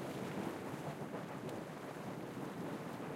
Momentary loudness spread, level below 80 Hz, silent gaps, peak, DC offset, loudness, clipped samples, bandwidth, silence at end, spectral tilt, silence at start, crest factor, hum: 3 LU; -74 dBFS; none; -30 dBFS; under 0.1%; -45 LUFS; under 0.1%; 16 kHz; 0 s; -6 dB/octave; 0 s; 16 dB; none